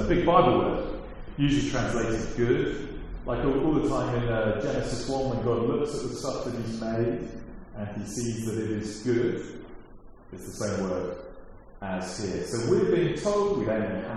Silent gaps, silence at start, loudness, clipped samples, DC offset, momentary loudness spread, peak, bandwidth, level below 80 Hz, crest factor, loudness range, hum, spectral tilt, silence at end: none; 0 s; -28 LUFS; under 0.1%; under 0.1%; 15 LU; -6 dBFS; 13 kHz; -42 dBFS; 22 dB; 5 LU; none; -6 dB/octave; 0 s